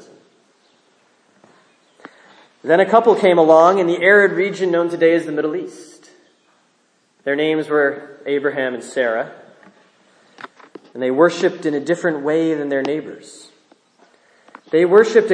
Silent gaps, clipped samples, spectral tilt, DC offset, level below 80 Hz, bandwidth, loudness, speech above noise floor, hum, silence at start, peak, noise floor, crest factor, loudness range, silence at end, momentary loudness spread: none; under 0.1%; -5.5 dB/octave; under 0.1%; -74 dBFS; 10.5 kHz; -16 LUFS; 45 dB; none; 2.65 s; 0 dBFS; -61 dBFS; 18 dB; 8 LU; 0 s; 17 LU